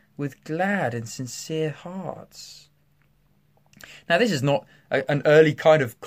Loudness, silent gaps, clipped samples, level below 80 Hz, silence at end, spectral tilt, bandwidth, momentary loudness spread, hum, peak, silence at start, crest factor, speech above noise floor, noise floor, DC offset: -22 LUFS; none; under 0.1%; -66 dBFS; 0 s; -5.5 dB/octave; 15.5 kHz; 21 LU; none; -4 dBFS; 0.2 s; 20 dB; 41 dB; -64 dBFS; under 0.1%